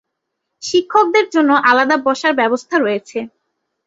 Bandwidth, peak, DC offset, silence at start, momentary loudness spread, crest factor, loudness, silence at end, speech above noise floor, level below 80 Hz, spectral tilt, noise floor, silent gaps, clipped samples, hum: 8 kHz; 0 dBFS; under 0.1%; 0.6 s; 15 LU; 16 dB; -14 LUFS; 0.6 s; 61 dB; -64 dBFS; -3 dB/octave; -76 dBFS; none; under 0.1%; none